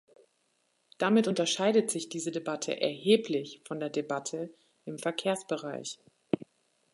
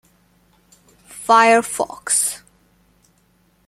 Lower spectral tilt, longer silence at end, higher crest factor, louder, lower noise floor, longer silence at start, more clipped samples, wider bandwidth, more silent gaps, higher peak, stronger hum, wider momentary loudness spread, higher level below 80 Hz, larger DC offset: first, -4 dB/octave vs -1 dB/octave; second, 0.55 s vs 1.3 s; about the same, 20 dB vs 20 dB; second, -31 LUFS vs -16 LUFS; first, -74 dBFS vs -59 dBFS; second, 1 s vs 1.15 s; neither; second, 11.5 kHz vs 15.5 kHz; neither; second, -10 dBFS vs -2 dBFS; neither; second, 14 LU vs 21 LU; second, -80 dBFS vs -62 dBFS; neither